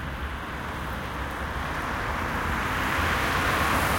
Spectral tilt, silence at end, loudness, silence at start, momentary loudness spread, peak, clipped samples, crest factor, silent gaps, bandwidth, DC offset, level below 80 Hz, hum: -4.5 dB/octave; 0 s; -27 LUFS; 0 s; 10 LU; -12 dBFS; under 0.1%; 16 dB; none; 17 kHz; under 0.1%; -38 dBFS; none